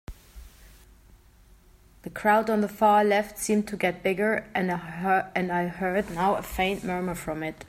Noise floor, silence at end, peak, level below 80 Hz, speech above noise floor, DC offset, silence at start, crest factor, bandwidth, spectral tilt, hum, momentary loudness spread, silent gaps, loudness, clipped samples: -55 dBFS; 0 s; -8 dBFS; -50 dBFS; 30 dB; under 0.1%; 0.1 s; 18 dB; 16 kHz; -5 dB/octave; none; 9 LU; none; -26 LUFS; under 0.1%